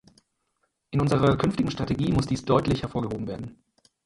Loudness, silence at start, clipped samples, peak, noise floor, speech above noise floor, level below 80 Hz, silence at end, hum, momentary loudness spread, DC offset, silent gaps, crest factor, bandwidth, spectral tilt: -25 LUFS; 0.9 s; under 0.1%; -6 dBFS; -75 dBFS; 50 dB; -46 dBFS; 0.5 s; none; 11 LU; under 0.1%; none; 20 dB; 11.5 kHz; -7 dB/octave